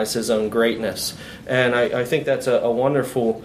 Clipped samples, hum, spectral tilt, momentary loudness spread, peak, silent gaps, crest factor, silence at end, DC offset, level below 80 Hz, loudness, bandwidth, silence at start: under 0.1%; none; -4.5 dB/octave; 6 LU; -2 dBFS; none; 18 dB; 0 s; under 0.1%; -52 dBFS; -21 LUFS; 15.5 kHz; 0 s